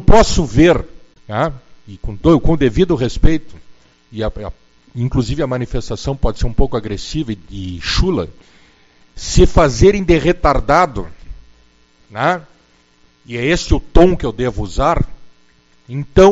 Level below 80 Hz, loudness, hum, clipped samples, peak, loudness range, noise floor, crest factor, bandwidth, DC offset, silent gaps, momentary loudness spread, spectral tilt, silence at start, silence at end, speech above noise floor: -22 dBFS; -16 LUFS; none; 0.1%; 0 dBFS; 6 LU; -52 dBFS; 14 dB; 8 kHz; under 0.1%; none; 17 LU; -6 dB/octave; 0 s; 0 s; 39 dB